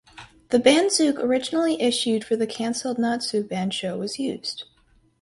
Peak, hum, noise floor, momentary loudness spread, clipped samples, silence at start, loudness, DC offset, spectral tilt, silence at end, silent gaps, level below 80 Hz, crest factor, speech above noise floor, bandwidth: -4 dBFS; none; -60 dBFS; 11 LU; under 0.1%; 0.15 s; -23 LUFS; under 0.1%; -3.5 dB/octave; 0.6 s; none; -64 dBFS; 20 dB; 38 dB; 11.5 kHz